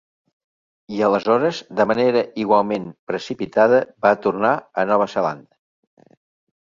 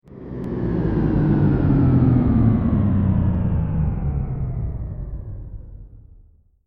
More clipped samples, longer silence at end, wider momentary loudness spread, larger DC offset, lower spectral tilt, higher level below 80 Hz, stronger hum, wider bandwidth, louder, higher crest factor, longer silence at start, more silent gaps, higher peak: neither; first, 1.3 s vs 0.7 s; second, 11 LU vs 17 LU; neither; second, -6 dB/octave vs -12.5 dB/octave; second, -62 dBFS vs -28 dBFS; neither; first, 7.4 kHz vs 4.3 kHz; about the same, -19 LUFS vs -20 LUFS; about the same, 18 dB vs 14 dB; first, 0.9 s vs 0.1 s; first, 2.99-3.07 s vs none; first, -2 dBFS vs -6 dBFS